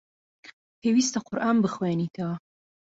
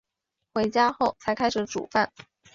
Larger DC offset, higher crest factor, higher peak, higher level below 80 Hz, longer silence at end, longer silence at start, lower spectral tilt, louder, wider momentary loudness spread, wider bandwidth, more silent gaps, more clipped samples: neither; about the same, 16 dB vs 18 dB; second, -12 dBFS vs -8 dBFS; second, -68 dBFS vs -60 dBFS; first, 0.6 s vs 0.45 s; about the same, 0.45 s vs 0.55 s; about the same, -5 dB/octave vs -4 dB/octave; about the same, -26 LUFS vs -26 LUFS; first, 10 LU vs 7 LU; about the same, 8 kHz vs 7.8 kHz; first, 0.53-0.82 s vs none; neither